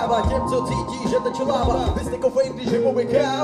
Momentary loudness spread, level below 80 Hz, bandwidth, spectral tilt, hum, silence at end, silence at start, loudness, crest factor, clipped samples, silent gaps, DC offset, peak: 3 LU; -34 dBFS; 12.5 kHz; -6 dB/octave; none; 0 s; 0 s; -22 LUFS; 14 dB; under 0.1%; none; under 0.1%; -6 dBFS